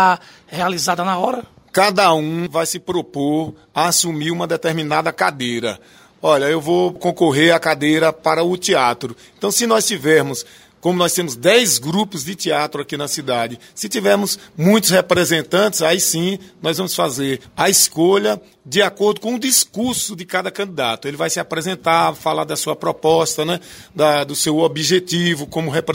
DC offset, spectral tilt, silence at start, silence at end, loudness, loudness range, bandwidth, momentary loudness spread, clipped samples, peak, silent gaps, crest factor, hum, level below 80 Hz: under 0.1%; -3.5 dB/octave; 0 s; 0 s; -17 LUFS; 3 LU; 16.5 kHz; 10 LU; under 0.1%; 0 dBFS; none; 18 dB; none; -58 dBFS